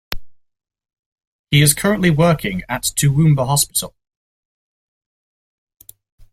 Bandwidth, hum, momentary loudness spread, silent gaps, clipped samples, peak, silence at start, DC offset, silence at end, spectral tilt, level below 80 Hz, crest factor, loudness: 16.5 kHz; none; 11 LU; 0.99-1.16 s, 1.27-1.44 s; under 0.1%; 0 dBFS; 0.1 s; under 0.1%; 2.45 s; -4.5 dB/octave; -42 dBFS; 20 dB; -16 LUFS